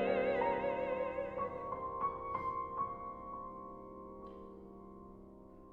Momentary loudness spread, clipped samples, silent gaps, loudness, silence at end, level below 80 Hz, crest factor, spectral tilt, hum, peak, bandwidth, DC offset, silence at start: 20 LU; under 0.1%; none; -39 LUFS; 0 s; -62 dBFS; 18 dB; -8 dB/octave; none; -22 dBFS; 5.2 kHz; under 0.1%; 0 s